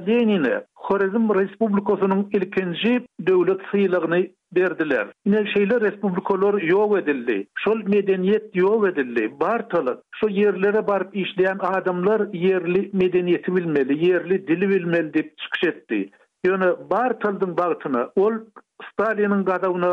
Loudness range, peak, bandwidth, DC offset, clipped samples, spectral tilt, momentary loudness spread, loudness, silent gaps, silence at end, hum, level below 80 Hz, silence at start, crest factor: 2 LU; -8 dBFS; 5 kHz; under 0.1%; under 0.1%; -8.5 dB/octave; 6 LU; -21 LUFS; none; 0 s; none; -66 dBFS; 0 s; 12 dB